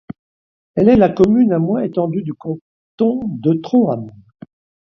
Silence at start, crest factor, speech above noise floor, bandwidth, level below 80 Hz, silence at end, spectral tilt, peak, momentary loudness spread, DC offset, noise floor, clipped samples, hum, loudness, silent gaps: 0.75 s; 16 dB; over 75 dB; 6.8 kHz; -46 dBFS; 0.75 s; -9.5 dB/octave; 0 dBFS; 16 LU; under 0.1%; under -90 dBFS; under 0.1%; none; -16 LUFS; 2.61-2.98 s